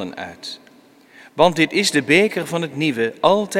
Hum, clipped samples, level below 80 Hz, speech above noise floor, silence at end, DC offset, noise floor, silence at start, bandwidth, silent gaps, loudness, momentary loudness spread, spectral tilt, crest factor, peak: none; under 0.1%; -60 dBFS; 31 dB; 0 s; under 0.1%; -50 dBFS; 0 s; 16.5 kHz; none; -17 LUFS; 18 LU; -4 dB/octave; 20 dB; 0 dBFS